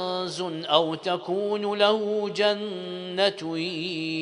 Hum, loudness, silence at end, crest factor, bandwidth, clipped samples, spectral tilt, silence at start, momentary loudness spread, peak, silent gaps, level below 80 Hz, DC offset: none; -26 LUFS; 0 s; 22 dB; 10.5 kHz; under 0.1%; -4.5 dB/octave; 0 s; 8 LU; -4 dBFS; none; -74 dBFS; under 0.1%